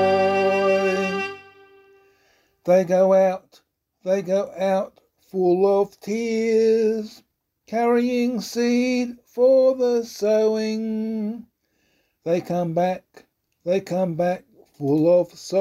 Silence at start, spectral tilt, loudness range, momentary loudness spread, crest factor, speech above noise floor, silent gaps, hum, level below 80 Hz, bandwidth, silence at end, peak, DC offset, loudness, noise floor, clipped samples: 0 s; -6 dB/octave; 5 LU; 13 LU; 14 dB; 47 dB; none; none; -68 dBFS; 15 kHz; 0 s; -6 dBFS; under 0.1%; -21 LUFS; -68 dBFS; under 0.1%